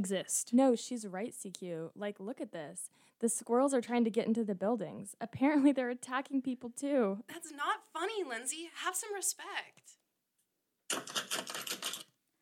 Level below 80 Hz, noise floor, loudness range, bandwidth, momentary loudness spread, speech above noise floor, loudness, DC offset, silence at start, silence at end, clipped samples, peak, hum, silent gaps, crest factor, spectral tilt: -86 dBFS; -82 dBFS; 6 LU; 17 kHz; 13 LU; 47 dB; -35 LUFS; under 0.1%; 0 s; 0.4 s; under 0.1%; -16 dBFS; none; none; 18 dB; -3.5 dB/octave